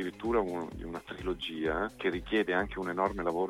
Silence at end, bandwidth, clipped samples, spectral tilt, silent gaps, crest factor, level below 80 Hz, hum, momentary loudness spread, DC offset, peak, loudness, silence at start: 0 s; 15.5 kHz; under 0.1%; -6 dB/octave; none; 18 dB; -50 dBFS; none; 8 LU; under 0.1%; -16 dBFS; -33 LUFS; 0 s